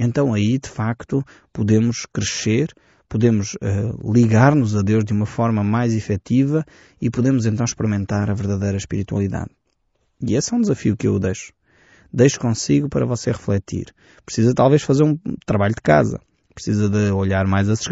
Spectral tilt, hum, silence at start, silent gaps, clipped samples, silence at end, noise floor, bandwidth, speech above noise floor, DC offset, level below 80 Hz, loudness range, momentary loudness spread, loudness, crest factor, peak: -7 dB/octave; none; 0 s; none; under 0.1%; 0 s; -68 dBFS; 8 kHz; 49 dB; under 0.1%; -46 dBFS; 4 LU; 10 LU; -19 LUFS; 16 dB; -2 dBFS